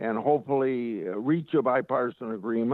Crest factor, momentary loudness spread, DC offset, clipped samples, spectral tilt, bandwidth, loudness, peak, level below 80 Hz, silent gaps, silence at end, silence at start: 14 dB; 6 LU; under 0.1%; under 0.1%; -10 dB/octave; 4.2 kHz; -27 LUFS; -12 dBFS; -74 dBFS; none; 0 s; 0 s